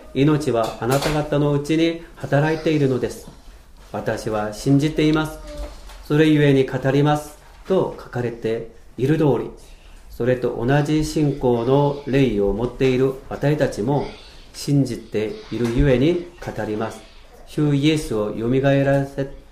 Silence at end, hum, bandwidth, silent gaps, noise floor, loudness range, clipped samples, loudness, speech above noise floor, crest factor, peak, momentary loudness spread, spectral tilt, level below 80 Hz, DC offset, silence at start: 0.1 s; none; 15.5 kHz; none; -43 dBFS; 3 LU; under 0.1%; -20 LUFS; 23 dB; 16 dB; -4 dBFS; 12 LU; -7 dB/octave; -38 dBFS; under 0.1%; 0 s